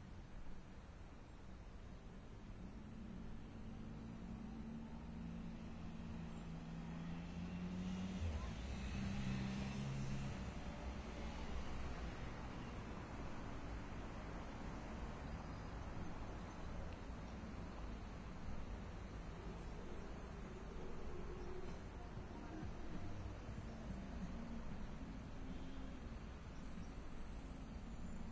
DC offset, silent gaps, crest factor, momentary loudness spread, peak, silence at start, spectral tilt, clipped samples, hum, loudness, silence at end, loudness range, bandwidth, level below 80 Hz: under 0.1%; none; 16 dB; 9 LU; -32 dBFS; 0 s; -6.5 dB/octave; under 0.1%; none; -51 LUFS; 0 s; 7 LU; 8 kHz; -54 dBFS